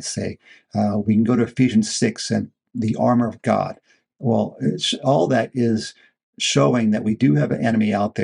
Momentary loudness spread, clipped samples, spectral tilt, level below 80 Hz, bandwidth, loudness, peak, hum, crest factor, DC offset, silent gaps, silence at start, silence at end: 9 LU; under 0.1%; -5.5 dB/octave; -62 dBFS; 11 kHz; -20 LUFS; -2 dBFS; none; 18 dB; under 0.1%; 6.23-6.33 s; 0 s; 0 s